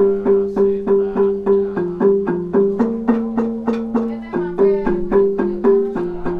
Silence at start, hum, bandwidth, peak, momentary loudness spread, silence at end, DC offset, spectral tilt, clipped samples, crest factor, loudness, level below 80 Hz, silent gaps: 0 s; none; 4.6 kHz; -4 dBFS; 6 LU; 0 s; under 0.1%; -10 dB/octave; under 0.1%; 14 dB; -18 LUFS; -40 dBFS; none